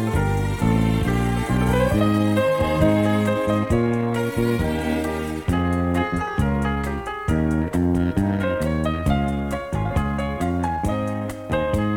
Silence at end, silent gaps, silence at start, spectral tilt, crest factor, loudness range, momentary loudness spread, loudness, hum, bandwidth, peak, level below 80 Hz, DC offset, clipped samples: 0 s; none; 0 s; -7 dB/octave; 16 dB; 3 LU; 6 LU; -22 LUFS; none; 17.5 kHz; -6 dBFS; -32 dBFS; under 0.1%; under 0.1%